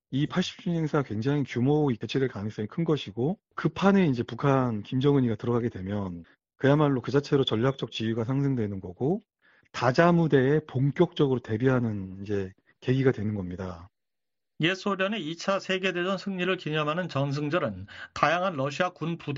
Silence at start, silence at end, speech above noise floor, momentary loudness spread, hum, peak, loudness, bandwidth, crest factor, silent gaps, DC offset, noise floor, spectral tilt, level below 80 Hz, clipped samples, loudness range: 0.1 s; 0 s; over 64 dB; 10 LU; none; -6 dBFS; -27 LUFS; 7.6 kHz; 20 dB; none; under 0.1%; under -90 dBFS; -5.5 dB/octave; -60 dBFS; under 0.1%; 4 LU